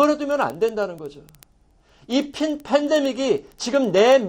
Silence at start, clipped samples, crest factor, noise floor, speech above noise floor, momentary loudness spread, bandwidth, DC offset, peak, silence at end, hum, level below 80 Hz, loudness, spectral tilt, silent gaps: 0 s; under 0.1%; 16 dB; -57 dBFS; 37 dB; 9 LU; 17 kHz; under 0.1%; -4 dBFS; 0 s; none; -58 dBFS; -21 LUFS; -4.5 dB/octave; none